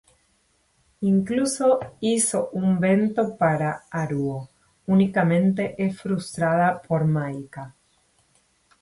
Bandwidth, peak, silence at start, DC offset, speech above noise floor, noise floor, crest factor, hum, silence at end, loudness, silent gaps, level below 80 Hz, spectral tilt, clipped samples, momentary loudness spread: 11.5 kHz; -8 dBFS; 1 s; under 0.1%; 44 dB; -66 dBFS; 16 dB; none; 1.1 s; -23 LUFS; none; -60 dBFS; -6 dB/octave; under 0.1%; 10 LU